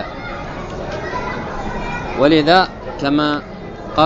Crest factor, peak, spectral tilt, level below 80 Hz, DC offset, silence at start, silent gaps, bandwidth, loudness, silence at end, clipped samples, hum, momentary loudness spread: 18 dB; 0 dBFS; -6 dB/octave; -34 dBFS; under 0.1%; 0 s; none; 8 kHz; -18 LUFS; 0 s; under 0.1%; none; 15 LU